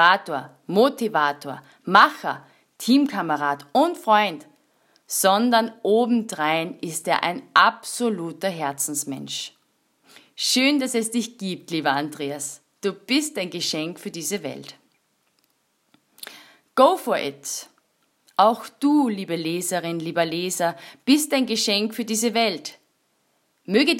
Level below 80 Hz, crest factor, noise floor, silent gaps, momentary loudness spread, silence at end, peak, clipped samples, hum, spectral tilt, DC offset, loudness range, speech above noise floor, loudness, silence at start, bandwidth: -78 dBFS; 22 dB; -68 dBFS; none; 13 LU; 0 s; 0 dBFS; under 0.1%; none; -3 dB/octave; under 0.1%; 6 LU; 46 dB; -22 LUFS; 0 s; 16.5 kHz